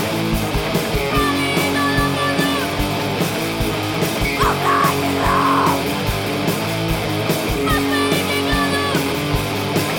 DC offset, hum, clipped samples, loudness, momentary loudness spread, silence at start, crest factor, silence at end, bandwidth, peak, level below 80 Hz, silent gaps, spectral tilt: under 0.1%; none; under 0.1%; -18 LUFS; 4 LU; 0 s; 14 dB; 0 s; 17 kHz; -4 dBFS; -32 dBFS; none; -4.5 dB/octave